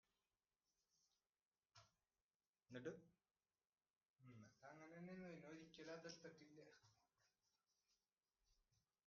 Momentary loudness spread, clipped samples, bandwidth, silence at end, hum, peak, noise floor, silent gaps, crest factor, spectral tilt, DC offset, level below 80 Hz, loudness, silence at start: 11 LU; under 0.1%; 6.8 kHz; 0.55 s; none; -40 dBFS; under -90 dBFS; 1.45-1.52 s, 2.22-2.29 s, 2.35-2.40 s, 2.47-2.54 s, 3.90-3.94 s, 4.05-4.14 s; 24 dB; -4.5 dB/octave; under 0.1%; under -90 dBFS; -61 LUFS; 0.95 s